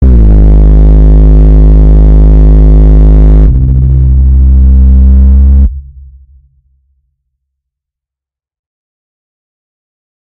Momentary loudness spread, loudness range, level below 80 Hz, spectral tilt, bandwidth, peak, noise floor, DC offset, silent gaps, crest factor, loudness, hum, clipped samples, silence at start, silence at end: 2 LU; 7 LU; -4 dBFS; -12 dB/octave; 2 kHz; 0 dBFS; -85 dBFS; under 0.1%; none; 4 dB; -5 LUFS; none; 1%; 0 s; 4.5 s